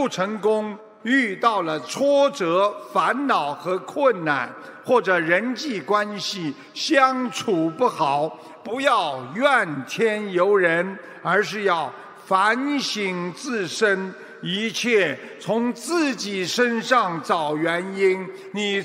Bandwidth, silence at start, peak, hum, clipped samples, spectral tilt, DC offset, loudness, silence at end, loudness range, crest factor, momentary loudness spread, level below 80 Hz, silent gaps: 16 kHz; 0 s; -4 dBFS; none; under 0.1%; -4 dB/octave; under 0.1%; -22 LUFS; 0 s; 2 LU; 18 dB; 9 LU; -78 dBFS; none